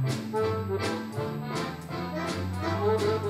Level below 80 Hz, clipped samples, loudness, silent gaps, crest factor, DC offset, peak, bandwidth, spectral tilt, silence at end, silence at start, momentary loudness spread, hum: -58 dBFS; under 0.1%; -30 LUFS; none; 14 dB; under 0.1%; -14 dBFS; 15 kHz; -6 dB/octave; 0 s; 0 s; 7 LU; none